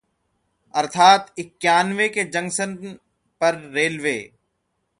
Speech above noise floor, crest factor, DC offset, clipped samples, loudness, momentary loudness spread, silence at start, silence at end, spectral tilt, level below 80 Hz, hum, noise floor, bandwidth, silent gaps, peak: 53 dB; 20 dB; under 0.1%; under 0.1%; -20 LUFS; 15 LU; 0.75 s; 0.75 s; -3 dB/octave; -68 dBFS; none; -73 dBFS; 11.5 kHz; none; -2 dBFS